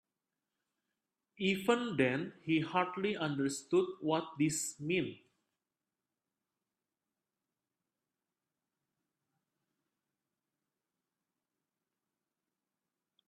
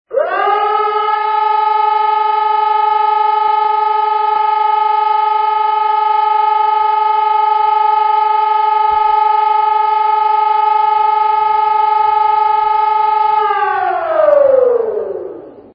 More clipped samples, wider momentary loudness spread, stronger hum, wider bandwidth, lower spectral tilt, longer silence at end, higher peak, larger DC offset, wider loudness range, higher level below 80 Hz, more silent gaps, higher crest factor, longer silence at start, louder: neither; first, 5 LU vs 2 LU; neither; first, 13.5 kHz vs 5.4 kHz; second, -4.5 dB/octave vs -6 dB/octave; first, 8.1 s vs 0.15 s; second, -16 dBFS vs 0 dBFS; neither; first, 8 LU vs 1 LU; second, -80 dBFS vs -58 dBFS; neither; first, 24 dB vs 12 dB; first, 1.4 s vs 0.1 s; second, -34 LUFS vs -12 LUFS